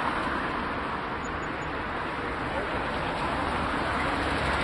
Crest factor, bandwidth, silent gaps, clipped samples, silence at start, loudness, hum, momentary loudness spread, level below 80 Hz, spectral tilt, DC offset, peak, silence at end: 16 dB; 11.5 kHz; none; under 0.1%; 0 s; -29 LUFS; none; 5 LU; -42 dBFS; -5.5 dB/octave; under 0.1%; -14 dBFS; 0 s